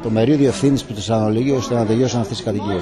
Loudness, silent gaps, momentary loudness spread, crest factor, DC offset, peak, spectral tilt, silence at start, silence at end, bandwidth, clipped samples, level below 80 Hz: -18 LUFS; none; 6 LU; 12 dB; under 0.1%; -6 dBFS; -6.5 dB/octave; 0 s; 0 s; 12.5 kHz; under 0.1%; -44 dBFS